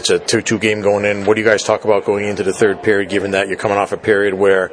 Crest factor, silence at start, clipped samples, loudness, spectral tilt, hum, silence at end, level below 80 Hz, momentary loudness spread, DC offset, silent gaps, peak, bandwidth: 14 dB; 0 s; under 0.1%; -15 LUFS; -4 dB/octave; none; 0 s; -54 dBFS; 4 LU; under 0.1%; none; 0 dBFS; 10.5 kHz